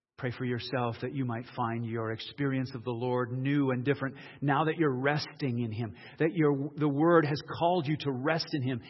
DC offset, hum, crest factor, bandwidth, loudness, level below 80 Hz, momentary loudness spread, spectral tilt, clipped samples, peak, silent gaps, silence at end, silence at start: under 0.1%; none; 20 dB; 6 kHz; -31 LUFS; -70 dBFS; 8 LU; -8 dB/octave; under 0.1%; -10 dBFS; none; 0 s; 0.2 s